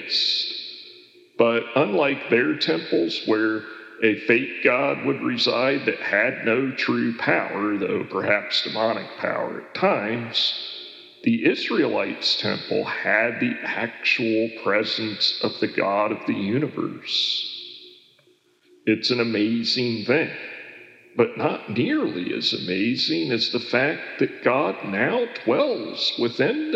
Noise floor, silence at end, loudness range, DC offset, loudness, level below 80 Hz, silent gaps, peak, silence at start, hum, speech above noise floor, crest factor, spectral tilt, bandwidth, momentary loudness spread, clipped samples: -60 dBFS; 0 s; 3 LU; under 0.1%; -22 LUFS; -80 dBFS; none; -4 dBFS; 0 s; none; 37 dB; 20 dB; -5 dB/octave; 8.2 kHz; 7 LU; under 0.1%